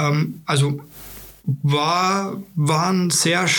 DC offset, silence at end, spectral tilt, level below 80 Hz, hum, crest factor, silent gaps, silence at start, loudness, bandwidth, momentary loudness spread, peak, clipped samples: under 0.1%; 0 s; -4 dB/octave; -56 dBFS; none; 16 dB; none; 0 s; -20 LUFS; 19 kHz; 14 LU; -4 dBFS; under 0.1%